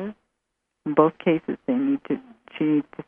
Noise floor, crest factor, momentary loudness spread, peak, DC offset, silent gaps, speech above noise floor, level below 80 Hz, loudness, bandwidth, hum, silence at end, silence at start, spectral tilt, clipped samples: -79 dBFS; 22 dB; 14 LU; -4 dBFS; under 0.1%; none; 57 dB; -66 dBFS; -24 LUFS; 3.6 kHz; none; 0.05 s; 0 s; -10 dB/octave; under 0.1%